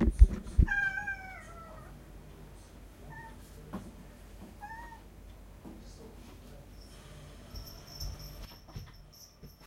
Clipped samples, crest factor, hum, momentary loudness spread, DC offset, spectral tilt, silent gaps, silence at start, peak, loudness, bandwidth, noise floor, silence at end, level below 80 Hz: under 0.1%; 28 dB; none; 23 LU; under 0.1%; -6 dB/octave; none; 0 s; -6 dBFS; -34 LUFS; 14 kHz; -54 dBFS; 0.15 s; -34 dBFS